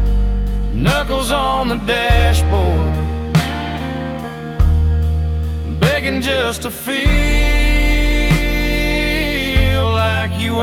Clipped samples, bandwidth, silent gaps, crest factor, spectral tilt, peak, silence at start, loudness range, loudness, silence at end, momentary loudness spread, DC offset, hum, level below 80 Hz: under 0.1%; 16.5 kHz; none; 14 dB; -5.5 dB/octave; 0 dBFS; 0 s; 2 LU; -17 LUFS; 0 s; 7 LU; under 0.1%; none; -18 dBFS